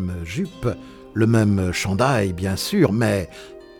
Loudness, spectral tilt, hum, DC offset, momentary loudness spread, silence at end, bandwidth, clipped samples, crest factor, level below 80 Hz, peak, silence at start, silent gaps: -21 LUFS; -6 dB/octave; none; under 0.1%; 12 LU; 0.1 s; 18.5 kHz; under 0.1%; 16 dB; -44 dBFS; -4 dBFS; 0 s; none